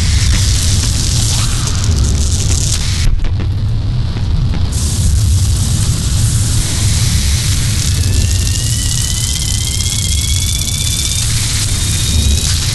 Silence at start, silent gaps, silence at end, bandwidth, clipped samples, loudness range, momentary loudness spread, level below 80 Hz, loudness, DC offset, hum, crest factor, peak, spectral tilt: 0 s; none; 0 s; 12.5 kHz; under 0.1%; 2 LU; 4 LU; -16 dBFS; -14 LUFS; under 0.1%; none; 12 dB; 0 dBFS; -3 dB/octave